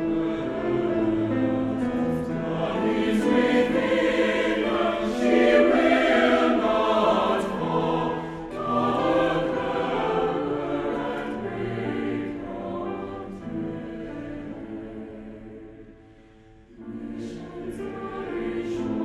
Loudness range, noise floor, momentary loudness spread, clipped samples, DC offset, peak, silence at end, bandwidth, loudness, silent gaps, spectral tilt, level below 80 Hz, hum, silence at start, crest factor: 17 LU; -51 dBFS; 16 LU; under 0.1%; under 0.1%; -6 dBFS; 0 s; 12 kHz; -24 LUFS; none; -6.5 dB/octave; -50 dBFS; none; 0 s; 18 dB